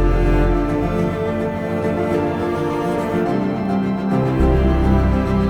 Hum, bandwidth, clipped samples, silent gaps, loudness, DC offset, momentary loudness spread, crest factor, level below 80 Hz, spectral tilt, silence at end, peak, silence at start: none; 12.5 kHz; under 0.1%; none; -19 LUFS; under 0.1%; 5 LU; 14 dB; -22 dBFS; -8.5 dB/octave; 0 s; -4 dBFS; 0 s